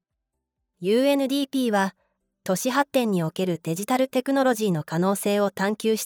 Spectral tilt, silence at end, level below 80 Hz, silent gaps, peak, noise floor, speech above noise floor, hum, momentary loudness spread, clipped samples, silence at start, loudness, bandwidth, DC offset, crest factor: -5 dB/octave; 0 s; -74 dBFS; none; -8 dBFS; -81 dBFS; 58 dB; none; 6 LU; under 0.1%; 0.8 s; -24 LUFS; 20 kHz; under 0.1%; 16 dB